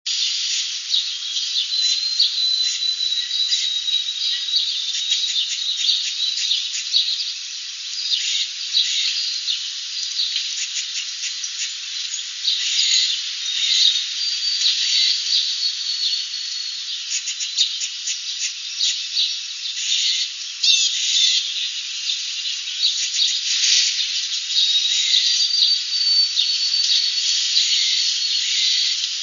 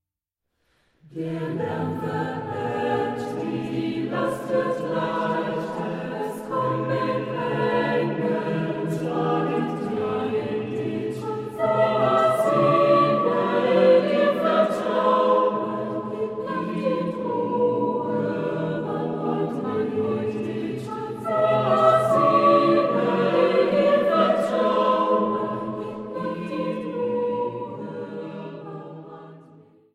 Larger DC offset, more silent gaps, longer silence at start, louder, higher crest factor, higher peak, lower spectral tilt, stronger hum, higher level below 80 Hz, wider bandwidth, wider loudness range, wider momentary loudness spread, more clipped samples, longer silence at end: neither; neither; second, 0.05 s vs 1.1 s; first, -18 LUFS vs -23 LUFS; about the same, 20 dB vs 18 dB; first, -2 dBFS vs -6 dBFS; second, 13 dB/octave vs -7 dB/octave; neither; second, under -90 dBFS vs -64 dBFS; second, 7.4 kHz vs 13.5 kHz; second, 5 LU vs 8 LU; second, 9 LU vs 12 LU; neither; second, 0 s vs 0.55 s